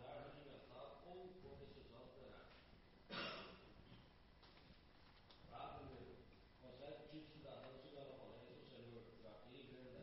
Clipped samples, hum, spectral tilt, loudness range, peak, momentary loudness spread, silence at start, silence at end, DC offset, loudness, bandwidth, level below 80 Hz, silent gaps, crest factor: under 0.1%; none; -3.5 dB/octave; 4 LU; -38 dBFS; 12 LU; 0 s; 0 s; under 0.1%; -59 LUFS; 5.6 kHz; -72 dBFS; none; 22 dB